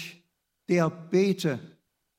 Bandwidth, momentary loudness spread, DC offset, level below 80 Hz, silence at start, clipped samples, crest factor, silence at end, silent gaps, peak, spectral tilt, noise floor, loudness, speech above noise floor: 15.5 kHz; 16 LU; under 0.1%; -74 dBFS; 0 s; under 0.1%; 18 dB; 0.5 s; none; -10 dBFS; -6.5 dB/octave; -71 dBFS; -27 LUFS; 46 dB